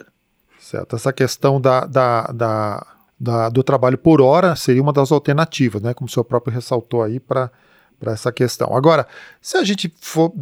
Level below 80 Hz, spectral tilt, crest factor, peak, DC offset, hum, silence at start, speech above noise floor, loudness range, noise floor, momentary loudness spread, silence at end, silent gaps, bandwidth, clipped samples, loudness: -56 dBFS; -6.5 dB/octave; 16 dB; -2 dBFS; under 0.1%; none; 0.75 s; 43 dB; 5 LU; -60 dBFS; 12 LU; 0 s; none; 17 kHz; under 0.1%; -17 LUFS